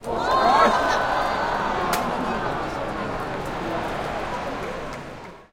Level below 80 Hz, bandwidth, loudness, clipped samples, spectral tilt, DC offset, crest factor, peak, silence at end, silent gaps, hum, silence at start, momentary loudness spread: -42 dBFS; 17 kHz; -23 LUFS; under 0.1%; -4.5 dB/octave; under 0.1%; 18 dB; -6 dBFS; 0.1 s; none; none; 0 s; 13 LU